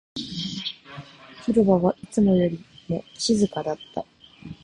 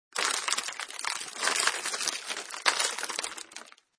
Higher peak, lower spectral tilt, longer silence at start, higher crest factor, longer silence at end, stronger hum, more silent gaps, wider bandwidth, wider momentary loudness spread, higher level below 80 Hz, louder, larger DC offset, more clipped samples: second, -8 dBFS vs -4 dBFS; first, -6 dB/octave vs 2.5 dB/octave; about the same, 0.15 s vs 0.15 s; second, 18 dB vs 28 dB; second, 0.1 s vs 0.3 s; neither; neither; about the same, 10.5 kHz vs 11 kHz; first, 22 LU vs 10 LU; first, -54 dBFS vs -82 dBFS; first, -24 LUFS vs -29 LUFS; neither; neither